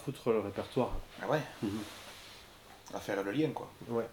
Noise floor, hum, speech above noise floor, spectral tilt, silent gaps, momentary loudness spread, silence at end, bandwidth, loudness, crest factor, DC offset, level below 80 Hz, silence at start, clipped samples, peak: -55 dBFS; none; 20 dB; -6 dB/octave; none; 17 LU; 0 s; 19 kHz; -36 LUFS; 20 dB; under 0.1%; -52 dBFS; 0 s; under 0.1%; -16 dBFS